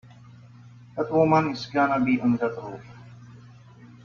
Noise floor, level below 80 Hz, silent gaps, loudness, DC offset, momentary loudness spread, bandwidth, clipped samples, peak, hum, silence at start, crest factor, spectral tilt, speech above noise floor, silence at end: -48 dBFS; -62 dBFS; none; -23 LUFS; under 0.1%; 19 LU; 7 kHz; under 0.1%; -8 dBFS; 60 Hz at -40 dBFS; 0.45 s; 18 dB; -7.5 dB/octave; 25 dB; 0.15 s